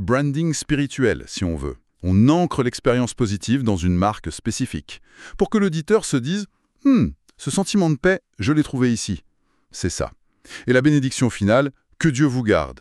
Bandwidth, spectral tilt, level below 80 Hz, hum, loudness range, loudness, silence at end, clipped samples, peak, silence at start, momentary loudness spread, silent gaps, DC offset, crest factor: 12.5 kHz; -6 dB/octave; -42 dBFS; none; 2 LU; -21 LUFS; 0.05 s; under 0.1%; -4 dBFS; 0 s; 12 LU; none; under 0.1%; 18 dB